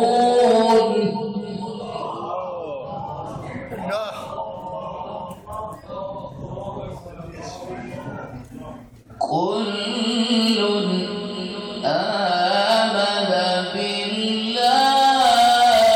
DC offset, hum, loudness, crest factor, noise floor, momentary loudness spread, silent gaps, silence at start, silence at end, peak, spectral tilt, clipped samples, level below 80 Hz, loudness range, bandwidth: under 0.1%; none; -20 LUFS; 16 dB; -41 dBFS; 18 LU; none; 0 s; 0 s; -6 dBFS; -4 dB/octave; under 0.1%; -54 dBFS; 15 LU; 17.5 kHz